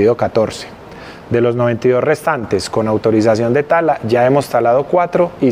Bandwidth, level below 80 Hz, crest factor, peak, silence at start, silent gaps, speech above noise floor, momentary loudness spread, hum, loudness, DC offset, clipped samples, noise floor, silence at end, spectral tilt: 16 kHz; -48 dBFS; 12 dB; -2 dBFS; 0 s; none; 20 dB; 7 LU; none; -14 LUFS; under 0.1%; under 0.1%; -34 dBFS; 0 s; -6.5 dB/octave